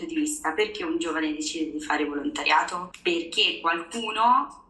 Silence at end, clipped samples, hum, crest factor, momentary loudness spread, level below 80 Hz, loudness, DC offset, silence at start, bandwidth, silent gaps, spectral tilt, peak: 0.1 s; under 0.1%; none; 16 dB; 8 LU; -60 dBFS; -25 LUFS; under 0.1%; 0 s; 12.5 kHz; none; -1.5 dB/octave; -10 dBFS